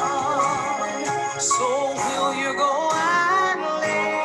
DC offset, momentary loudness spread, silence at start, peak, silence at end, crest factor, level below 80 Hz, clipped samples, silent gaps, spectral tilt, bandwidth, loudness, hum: under 0.1%; 6 LU; 0 s; -8 dBFS; 0 s; 14 dB; -62 dBFS; under 0.1%; none; -2 dB/octave; 12.5 kHz; -22 LUFS; none